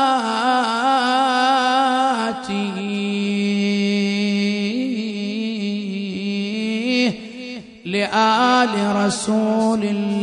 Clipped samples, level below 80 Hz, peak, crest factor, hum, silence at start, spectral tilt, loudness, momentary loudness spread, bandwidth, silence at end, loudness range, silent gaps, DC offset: under 0.1%; -64 dBFS; -4 dBFS; 16 dB; none; 0 s; -4.5 dB/octave; -19 LUFS; 8 LU; 10.5 kHz; 0 s; 4 LU; none; under 0.1%